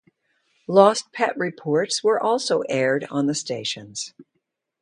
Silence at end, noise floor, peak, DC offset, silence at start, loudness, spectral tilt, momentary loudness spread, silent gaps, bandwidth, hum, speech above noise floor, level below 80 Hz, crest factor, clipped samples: 0.6 s; -76 dBFS; 0 dBFS; under 0.1%; 0.7 s; -22 LUFS; -4 dB/octave; 14 LU; none; 10.5 kHz; none; 54 dB; -72 dBFS; 22 dB; under 0.1%